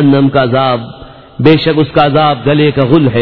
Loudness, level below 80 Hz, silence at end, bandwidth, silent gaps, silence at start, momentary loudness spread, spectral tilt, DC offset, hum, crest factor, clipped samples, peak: -10 LUFS; -40 dBFS; 0 s; 5.4 kHz; none; 0 s; 5 LU; -10 dB/octave; 1%; none; 10 dB; 0.8%; 0 dBFS